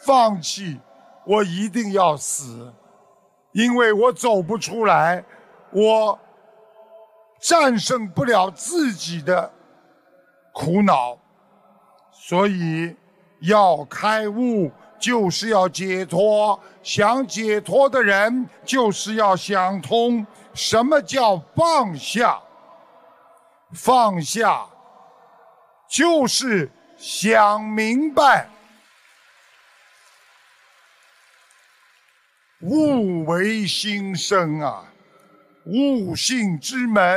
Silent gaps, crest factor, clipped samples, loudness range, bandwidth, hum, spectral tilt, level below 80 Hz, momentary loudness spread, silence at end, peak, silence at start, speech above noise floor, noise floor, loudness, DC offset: none; 18 dB; under 0.1%; 4 LU; 15.5 kHz; none; -4 dB/octave; -64 dBFS; 11 LU; 0 s; -2 dBFS; 0.05 s; 42 dB; -61 dBFS; -19 LUFS; under 0.1%